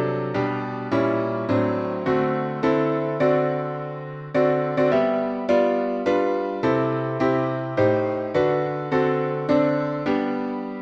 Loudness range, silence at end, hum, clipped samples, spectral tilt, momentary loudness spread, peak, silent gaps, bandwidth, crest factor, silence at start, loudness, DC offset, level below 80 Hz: 1 LU; 0 s; none; under 0.1%; -8.5 dB/octave; 5 LU; -8 dBFS; none; 7.6 kHz; 14 dB; 0 s; -23 LUFS; under 0.1%; -58 dBFS